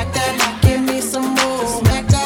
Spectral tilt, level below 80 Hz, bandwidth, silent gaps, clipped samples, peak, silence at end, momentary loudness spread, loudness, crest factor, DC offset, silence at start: -4.5 dB/octave; -28 dBFS; 18 kHz; none; under 0.1%; 0 dBFS; 0 s; 4 LU; -17 LUFS; 16 dB; under 0.1%; 0 s